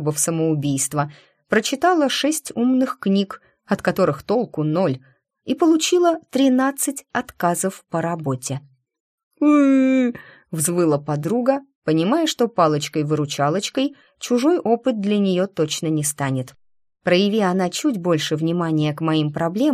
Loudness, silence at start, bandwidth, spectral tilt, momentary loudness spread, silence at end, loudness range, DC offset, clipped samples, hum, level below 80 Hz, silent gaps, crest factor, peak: -20 LUFS; 0 s; 15.5 kHz; -5 dB/octave; 9 LU; 0 s; 2 LU; under 0.1%; under 0.1%; none; -62 dBFS; 9.00-9.31 s, 11.75-11.82 s; 16 dB; -4 dBFS